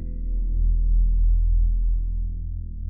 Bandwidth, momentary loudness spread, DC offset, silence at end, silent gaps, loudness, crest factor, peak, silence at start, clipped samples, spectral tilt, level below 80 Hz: 0.5 kHz; 9 LU; 1%; 0 s; none; -26 LUFS; 8 dB; -12 dBFS; 0 s; under 0.1%; -17.5 dB/octave; -20 dBFS